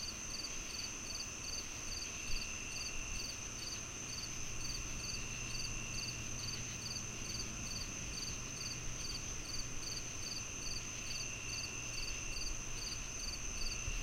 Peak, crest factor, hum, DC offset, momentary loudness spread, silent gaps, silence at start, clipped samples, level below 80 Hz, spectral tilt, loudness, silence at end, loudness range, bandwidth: -26 dBFS; 18 dB; none; under 0.1%; 1 LU; none; 0 s; under 0.1%; -50 dBFS; -1.5 dB/octave; -41 LUFS; 0 s; 1 LU; 16.5 kHz